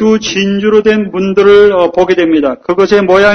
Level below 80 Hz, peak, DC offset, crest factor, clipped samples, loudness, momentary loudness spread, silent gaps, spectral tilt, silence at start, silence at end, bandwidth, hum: -40 dBFS; 0 dBFS; under 0.1%; 8 dB; 2%; -9 LUFS; 7 LU; none; -5.5 dB/octave; 0 s; 0 s; 6.6 kHz; none